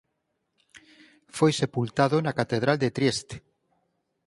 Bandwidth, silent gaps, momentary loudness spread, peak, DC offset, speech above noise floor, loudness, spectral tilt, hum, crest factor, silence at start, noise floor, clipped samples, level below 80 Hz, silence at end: 11.5 kHz; none; 15 LU; -6 dBFS; under 0.1%; 53 dB; -25 LUFS; -5.5 dB/octave; none; 22 dB; 1.35 s; -78 dBFS; under 0.1%; -62 dBFS; 0.9 s